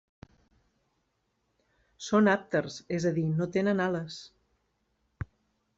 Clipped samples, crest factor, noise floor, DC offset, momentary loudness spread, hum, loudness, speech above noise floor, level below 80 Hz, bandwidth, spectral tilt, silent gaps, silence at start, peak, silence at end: under 0.1%; 20 dB; -77 dBFS; under 0.1%; 19 LU; none; -28 LUFS; 49 dB; -62 dBFS; 8 kHz; -6.5 dB/octave; none; 2 s; -12 dBFS; 0.55 s